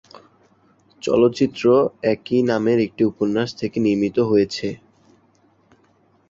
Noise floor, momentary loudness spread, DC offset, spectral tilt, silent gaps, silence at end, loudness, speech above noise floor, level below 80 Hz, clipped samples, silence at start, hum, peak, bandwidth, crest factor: -59 dBFS; 8 LU; under 0.1%; -6.5 dB/octave; none; 1.55 s; -20 LUFS; 40 dB; -56 dBFS; under 0.1%; 1.05 s; none; -4 dBFS; 7.8 kHz; 16 dB